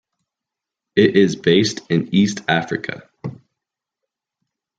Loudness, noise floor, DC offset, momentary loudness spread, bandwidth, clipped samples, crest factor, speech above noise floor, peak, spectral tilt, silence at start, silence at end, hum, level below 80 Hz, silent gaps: -17 LUFS; -85 dBFS; under 0.1%; 18 LU; 9 kHz; under 0.1%; 20 dB; 68 dB; 0 dBFS; -5.5 dB/octave; 0.95 s; 1.45 s; none; -60 dBFS; none